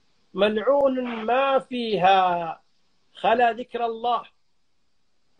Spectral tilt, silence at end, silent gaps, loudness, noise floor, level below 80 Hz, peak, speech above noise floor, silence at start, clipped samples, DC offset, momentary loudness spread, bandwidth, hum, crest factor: -6 dB/octave; 1.15 s; none; -23 LUFS; -75 dBFS; -66 dBFS; -8 dBFS; 53 dB; 0.35 s; under 0.1%; under 0.1%; 10 LU; 9.4 kHz; none; 16 dB